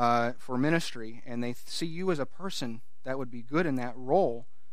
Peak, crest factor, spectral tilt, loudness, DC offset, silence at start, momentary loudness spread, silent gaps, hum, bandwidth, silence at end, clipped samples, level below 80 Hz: -10 dBFS; 20 dB; -5.5 dB/octave; -31 LUFS; 2%; 0 s; 12 LU; none; none; 15.5 kHz; 0.3 s; under 0.1%; -68 dBFS